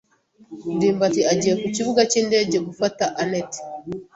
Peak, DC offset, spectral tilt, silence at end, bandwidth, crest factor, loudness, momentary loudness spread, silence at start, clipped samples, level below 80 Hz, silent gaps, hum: -4 dBFS; under 0.1%; -4 dB/octave; 0.15 s; 8.2 kHz; 18 dB; -21 LUFS; 14 LU; 0.5 s; under 0.1%; -60 dBFS; none; none